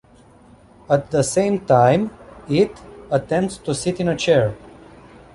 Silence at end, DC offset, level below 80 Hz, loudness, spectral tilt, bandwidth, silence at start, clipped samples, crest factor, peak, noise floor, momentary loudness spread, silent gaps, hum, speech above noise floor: 0.75 s; under 0.1%; -50 dBFS; -19 LUFS; -5.5 dB/octave; 11.5 kHz; 0.9 s; under 0.1%; 18 dB; -2 dBFS; -49 dBFS; 9 LU; none; none; 31 dB